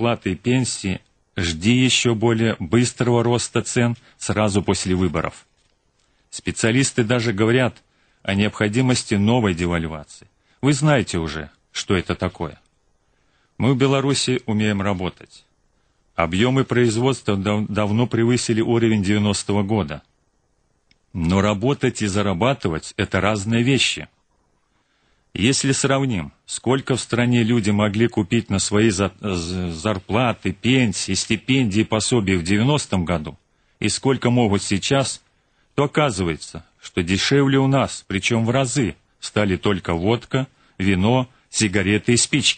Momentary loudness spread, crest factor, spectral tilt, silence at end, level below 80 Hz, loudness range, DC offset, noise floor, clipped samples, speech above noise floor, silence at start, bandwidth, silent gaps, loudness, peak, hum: 9 LU; 16 dB; -5 dB/octave; 0 s; -46 dBFS; 3 LU; under 0.1%; -65 dBFS; under 0.1%; 45 dB; 0 s; 9.4 kHz; none; -20 LUFS; -4 dBFS; none